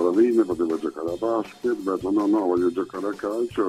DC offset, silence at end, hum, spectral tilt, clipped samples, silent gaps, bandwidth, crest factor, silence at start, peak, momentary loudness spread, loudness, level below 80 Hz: under 0.1%; 0 s; none; -7 dB/octave; under 0.1%; none; 12 kHz; 14 dB; 0 s; -8 dBFS; 8 LU; -24 LUFS; -58 dBFS